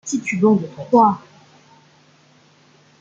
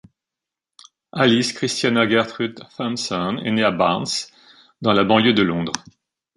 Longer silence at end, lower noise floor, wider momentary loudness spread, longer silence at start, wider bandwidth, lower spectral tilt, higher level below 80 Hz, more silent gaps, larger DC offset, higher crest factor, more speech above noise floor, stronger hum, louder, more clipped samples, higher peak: first, 1.8 s vs 0.55 s; second, -53 dBFS vs -87 dBFS; second, 8 LU vs 12 LU; second, 0.05 s vs 1.15 s; second, 8 kHz vs 11.5 kHz; first, -6.5 dB/octave vs -4.5 dB/octave; second, -66 dBFS vs -56 dBFS; neither; neither; about the same, 18 dB vs 20 dB; second, 36 dB vs 67 dB; neither; about the same, -17 LUFS vs -19 LUFS; neither; about the same, -2 dBFS vs 0 dBFS